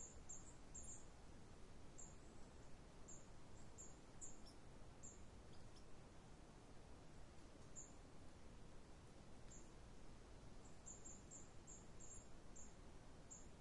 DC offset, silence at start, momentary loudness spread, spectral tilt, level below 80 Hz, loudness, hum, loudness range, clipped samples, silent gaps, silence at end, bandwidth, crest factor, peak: under 0.1%; 0 s; 6 LU; -3.5 dB/octave; -66 dBFS; -62 LUFS; none; 3 LU; under 0.1%; none; 0 s; 11 kHz; 16 dB; -42 dBFS